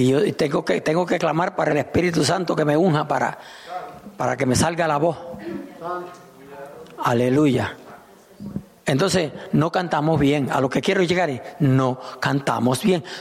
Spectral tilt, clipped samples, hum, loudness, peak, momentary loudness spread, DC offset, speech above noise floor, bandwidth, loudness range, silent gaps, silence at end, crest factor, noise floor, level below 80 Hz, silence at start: -5.5 dB/octave; under 0.1%; none; -21 LUFS; -6 dBFS; 15 LU; under 0.1%; 25 dB; 15.5 kHz; 4 LU; none; 0 s; 14 dB; -46 dBFS; -52 dBFS; 0 s